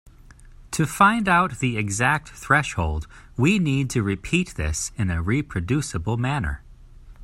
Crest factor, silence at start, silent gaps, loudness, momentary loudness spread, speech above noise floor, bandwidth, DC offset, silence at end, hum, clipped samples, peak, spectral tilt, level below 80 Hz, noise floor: 20 dB; 0.4 s; none; -23 LUFS; 9 LU; 24 dB; 16 kHz; under 0.1%; 0 s; none; under 0.1%; -2 dBFS; -5 dB/octave; -40 dBFS; -47 dBFS